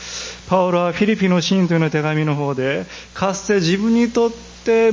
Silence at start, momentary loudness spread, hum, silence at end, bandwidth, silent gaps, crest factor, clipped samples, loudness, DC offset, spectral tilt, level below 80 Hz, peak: 0 s; 8 LU; none; 0 s; 7.6 kHz; none; 16 dB; under 0.1%; -18 LUFS; under 0.1%; -5.5 dB/octave; -48 dBFS; -2 dBFS